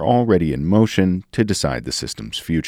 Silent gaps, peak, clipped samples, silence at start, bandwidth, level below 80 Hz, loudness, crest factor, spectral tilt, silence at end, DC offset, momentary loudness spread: none; -2 dBFS; under 0.1%; 0 s; 16 kHz; -40 dBFS; -19 LUFS; 16 dB; -5.5 dB/octave; 0 s; under 0.1%; 9 LU